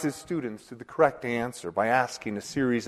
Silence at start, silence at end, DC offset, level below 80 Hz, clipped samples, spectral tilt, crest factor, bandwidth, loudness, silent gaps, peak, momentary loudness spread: 0 s; 0 s; under 0.1%; -62 dBFS; under 0.1%; -5 dB/octave; 22 dB; 13.5 kHz; -28 LUFS; none; -6 dBFS; 12 LU